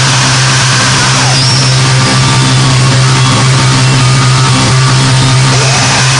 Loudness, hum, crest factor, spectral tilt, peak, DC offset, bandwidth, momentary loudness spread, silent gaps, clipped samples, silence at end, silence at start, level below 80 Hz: -6 LUFS; none; 6 dB; -3.5 dB/octave; 0 dBFS; 1%; 10.5 kHz; 1 LU; none; 0.3%; 0 s; 0 s; -32 dBFS